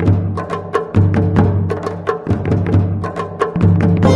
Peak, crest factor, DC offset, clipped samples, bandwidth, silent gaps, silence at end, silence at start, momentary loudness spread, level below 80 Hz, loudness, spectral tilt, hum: 0 dBFS; 14 dB; under 0.1%; under 0.1%; 7.2 kHz; none; 0 s; 0 s; 8 LU; -34 dBFS; -16 LUFS; -9 dB/octave; none